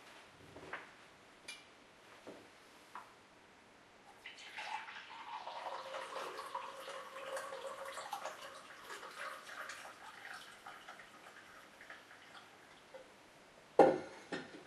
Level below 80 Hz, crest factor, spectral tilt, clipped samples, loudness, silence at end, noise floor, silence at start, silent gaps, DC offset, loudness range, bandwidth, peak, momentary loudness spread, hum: -84 dBFS; 32 dB; -3.5 dB/octave; under 0.1%; -42 LUFS; 0 s; -63 dBFS; 0 s; none; under 0.1%; 17 LU; 13.5 kHz; -12 dBFS; 15 LU; none